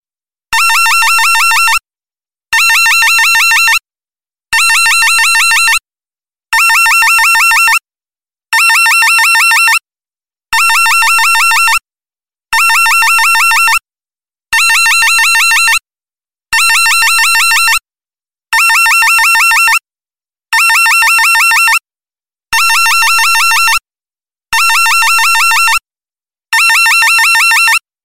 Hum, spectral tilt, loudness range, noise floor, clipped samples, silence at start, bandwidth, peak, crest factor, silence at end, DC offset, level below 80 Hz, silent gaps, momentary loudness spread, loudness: none; 4.5 dB/octave; 2 LU; under -90 dBFS; under 0.1%; 0 s; 16.5 kHz; 0 dBFS; 10 dB; 0 s; 2%; -48 dBFS; none; 7 LU; -6 LUFS